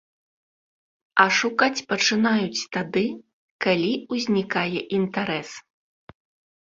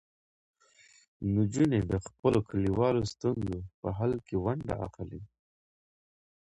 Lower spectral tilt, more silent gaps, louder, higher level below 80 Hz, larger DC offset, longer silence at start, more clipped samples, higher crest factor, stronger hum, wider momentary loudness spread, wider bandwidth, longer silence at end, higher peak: second, -4 dB/octave vs -7.5 dB/octave; first, 3.33-3.59 s vs 2.19-2.23 s, 3.74-3.83 s; first, -23 LUFS vs -31 LUFS; second, -66 dBFS vs -50 dBFS; neither; about the same, 1.15 s vs 1.2 s; neither; about the same, 22 dB vs 18 dB; neither; about the same, 10 LU vs 11 LU; second, 7.8 kHz vs 11 kHz; second, 1.05 s vs 1.3 s; first, -2 dBFS vs -14 dBFS